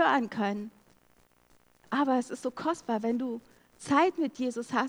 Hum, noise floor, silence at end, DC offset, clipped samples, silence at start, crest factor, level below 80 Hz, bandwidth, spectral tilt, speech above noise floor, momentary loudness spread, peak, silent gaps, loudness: 60 Hz at -60 dBFS; -65 dBFS; 0 s; under 0.1%; under 0.1%; 0 s; 20 dB; -72 dBFS; 19 kHz; -5 dB/octave; 35 dB; 12 LU; -10 dBFS; none; -30 LUFS